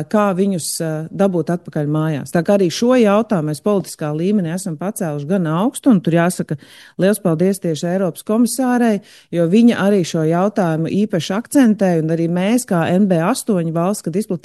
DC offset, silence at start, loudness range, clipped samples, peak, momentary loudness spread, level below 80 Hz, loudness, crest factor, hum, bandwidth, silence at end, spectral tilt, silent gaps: under 0.1%; 0 s; 2 LU; under 0.1%; -2 dBFS; 8 LU; -62 dBFS; -17 LUFS; 14 dB; none; 12.5 kHz; 0.05 s; -6 dB/octave; none